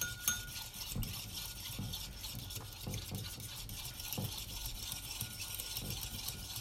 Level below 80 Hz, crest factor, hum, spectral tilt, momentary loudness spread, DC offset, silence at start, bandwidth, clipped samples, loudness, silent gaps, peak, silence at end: -52 dBFS; 30 dB; none; -2 dB/octave; 4 LU; under 0.1%; 0 s; 16.5 kHz; under 0.1%; -41 LUFS; none; -12 dBFS; 0 s